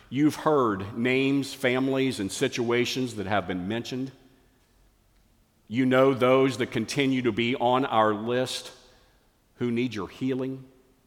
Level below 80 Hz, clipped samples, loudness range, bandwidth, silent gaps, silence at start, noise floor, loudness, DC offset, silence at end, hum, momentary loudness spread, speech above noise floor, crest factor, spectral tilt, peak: -64 dBFS; under 0.1%; 6 LU; 16.5 kHz; none; 0.1 s; -63 dBFS; -26 LUFS; under 0.1%; 0.4 s; none; 11 LU; 38 dB; 18 dB; -5.5 dB/octave; -8 dBFS